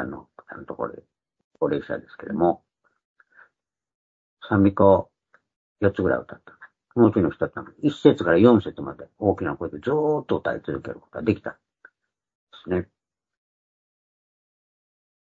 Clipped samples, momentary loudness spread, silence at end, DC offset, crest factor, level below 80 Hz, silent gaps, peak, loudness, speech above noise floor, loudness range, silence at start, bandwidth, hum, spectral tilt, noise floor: under 0.1%; 20 LU; 2.5 s; under 0.1%; 22 dB; -58 dBFS; 1.44-1.51 s, 3.05-3.15 s, 3.95-4.37 s, 5.56-5.76 s, 12.35-12.47 s; -2 dBFS; -23 LUFS; 51 dB; 11 LU; 0 s; 7.6 kHz; none; -9 dB/octave; -73 dBFS